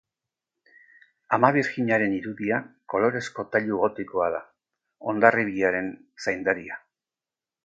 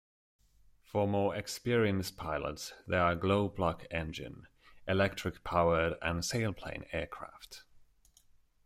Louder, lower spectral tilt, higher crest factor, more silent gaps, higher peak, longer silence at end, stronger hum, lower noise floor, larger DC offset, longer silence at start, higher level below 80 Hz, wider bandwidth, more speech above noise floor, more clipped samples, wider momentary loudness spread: first, -25 LUFS vs -33 LUFS; about the same, -6.5 dB/octave vs -5.5 dB/octave; first, 26 dB vs 18 dB; neither; first, 0 dBFS vs -16 dBFS; about the same, 0.9 s vs 0.9 s; neither; first, under -90 dBFS vs -65 dBFS; neither; first, 1.3 s vs 0.95 s; second, -64 dBFS vs -56 dBFS; second, 9 kHz vs 16 kHz; first, over 66 dB vs 32 dB; neither; second, 11 LU vs 17 LU